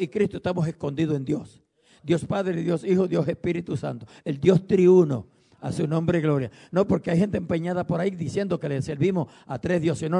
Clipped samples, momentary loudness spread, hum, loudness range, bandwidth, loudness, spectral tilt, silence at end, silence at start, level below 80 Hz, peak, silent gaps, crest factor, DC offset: under 0.1%; 11 LU; none; 4 LU; 10.5 kHz; -24 LUFS; -8 dB/octave; 0 s; 0 s; -56 dBFS; -6 dBFS; none; 18 dB; under 0.1%